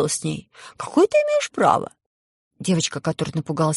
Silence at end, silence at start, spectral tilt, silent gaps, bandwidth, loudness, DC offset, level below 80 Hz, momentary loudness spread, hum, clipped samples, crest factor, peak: 0 s; 0 s; -5 dB/octave; 2.06-2.51 s; 11.5 kHz; -21 LUFS; under 0.1%; -60 dBFS; 13 LU; none; under 0.1%; 20 dB; -2 dBFS